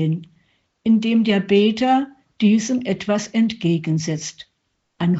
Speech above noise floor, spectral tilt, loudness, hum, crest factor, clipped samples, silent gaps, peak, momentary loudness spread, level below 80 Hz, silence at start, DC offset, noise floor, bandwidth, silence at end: 53 dB; -5.5 dB/octave; -19 LUFS; none; 14 dB; under 0.1%; none; -4 dBFS; 10 LU; -62 dBFS; 0 s; under 0.1%; -71 dBFS; 8 kHz; 0 s